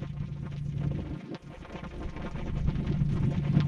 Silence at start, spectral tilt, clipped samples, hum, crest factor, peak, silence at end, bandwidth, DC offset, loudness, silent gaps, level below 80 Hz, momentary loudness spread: 0 s; -9 dB/octave; under 0.1%; none; 20 dB; -10 dBFS; 0 s; 7 kHz; under 0.1%; -33 LUFS; none; -40 dBFS; 14 LU